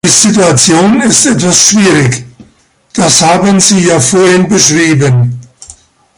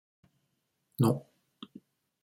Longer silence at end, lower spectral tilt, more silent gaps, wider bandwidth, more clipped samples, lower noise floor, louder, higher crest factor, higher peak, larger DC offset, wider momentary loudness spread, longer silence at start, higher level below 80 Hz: second, 0.45 s vs 1.05 s; second, -3.5 dB/octave vs -7.5 dB/octave; neither; about the same, 16 kHz vs 16 kHz; first, 0.6% vs under 0.1%; second, -47 dBFS vs -79 dBFS; first, -6 LUFS vs -30 LUFS; second, 8 dB vs 22 dB; first, 0 dBFS vs -14 dBFS; neither; second, 7 LU vs 22 LU; second, 0.05 s vs 1 s; first, -42 dBFS vs -72 dBFS